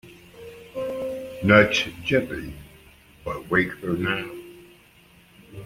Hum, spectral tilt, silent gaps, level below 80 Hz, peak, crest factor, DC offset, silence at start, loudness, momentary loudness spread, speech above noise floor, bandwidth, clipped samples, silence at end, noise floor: none; -5.5 dB/octave; none; -52 dBFS; -2 dBFS; 24 dB; under 0.1%; 0.05 s; -23 LUFS; 26 LU; 32 dB; 16.5 kHz; under 0.1%; 0 s; -54 dBFS